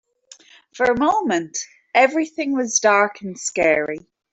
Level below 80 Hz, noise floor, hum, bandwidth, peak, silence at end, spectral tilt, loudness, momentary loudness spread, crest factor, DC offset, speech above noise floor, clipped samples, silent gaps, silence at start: -58 dBFS; -49 dBFS; none; 8.4 kHz; -2 dBFS; 0.35 s; -2.5 dB/octave; -19 LUFS; 12 LU; 18 dB; under 0.1%; 30 dB; under 0.1%; none; 0.75 s